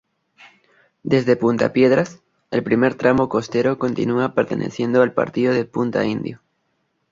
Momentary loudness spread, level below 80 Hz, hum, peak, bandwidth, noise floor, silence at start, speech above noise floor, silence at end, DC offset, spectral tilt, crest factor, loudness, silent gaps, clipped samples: 8 LU; -56 dBFS; none; -2 dBFS; 7.6 kHz; -69 dBFS; 1.05 s; 51 dB; 0.75 s; under 0.1%; -7 dB/octave; 18 dB; -19 LUFS; none; under 0.1%